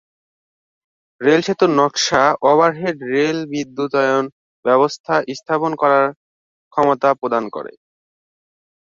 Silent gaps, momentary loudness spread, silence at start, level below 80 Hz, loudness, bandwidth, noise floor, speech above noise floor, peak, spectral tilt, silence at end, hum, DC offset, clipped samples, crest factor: 4.32-4.63 s, 5.00-5.04 s, 6.17-6.71 s; 10 LU; 1.2 s; -60 dBFS; -17 LUFS; 7.6 kHz; under -90 dBFS; over 74 dB; 0 dBFS; -4.5 dB/octave; 1.15 s; none; under 0.1%; under 0.1%; 18 dB